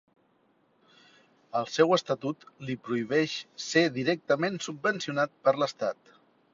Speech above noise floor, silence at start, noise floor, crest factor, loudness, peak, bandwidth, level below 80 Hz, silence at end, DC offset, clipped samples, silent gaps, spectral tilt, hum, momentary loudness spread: 40 dB; 1.55 s; -68 dBFS; 22 dB; -28 LUFS; -8 dBFS; 7.6 kHz; -74 dBFS; 0.6 s; under 0.1%; under 0.1%; none; -4.5 dB/octave; none; 11 LU